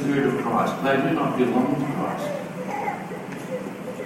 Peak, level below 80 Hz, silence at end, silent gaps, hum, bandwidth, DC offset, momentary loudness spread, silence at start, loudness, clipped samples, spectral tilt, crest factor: -8 dBFS; -62 dBFS; 0 s; none; none; 16 kHz; under 0.1%; 10 LU; 0 s; -25 LUFS; under 0.1%; -6.5 dB/octave; 16 dB